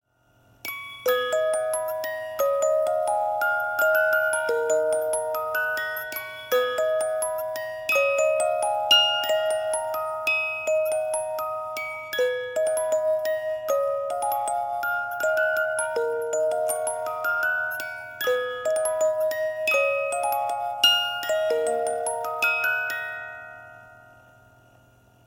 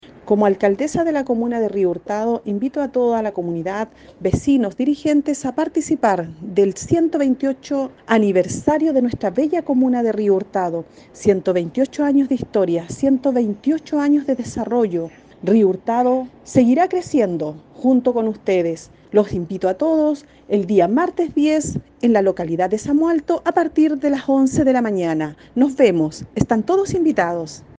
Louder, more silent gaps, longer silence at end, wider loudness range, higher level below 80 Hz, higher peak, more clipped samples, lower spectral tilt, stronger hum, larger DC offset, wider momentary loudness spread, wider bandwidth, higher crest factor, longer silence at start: second, -24 LUFS vs -19 LUFS; neither; first, 1.3 s vs 0.2 s; about the same, 4 LU vs 2 LU; second, -70 dBFS vs -50 dBFS; second, -6 dBFS vs 0 dBFS; neither; second, 0 dB/octave vs -6.5 dB/octave; neither; neither; about the same, 9 LU vs 7 LU; first, 17 kHz vs 9.6 kHz; about the same, 18 dB vs 18 dB; first, 0.65 s vs 0.25 s